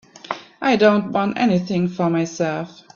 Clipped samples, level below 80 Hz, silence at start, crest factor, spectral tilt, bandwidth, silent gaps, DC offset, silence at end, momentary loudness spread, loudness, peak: under 0.1%; -60 dBFS; 0.25 s; 18 dB; -6.5 dB/octave; 7.4 kHz; none; under 0.1%; 0.25 s; 15 LU; -19 LUFS; -2 dBFS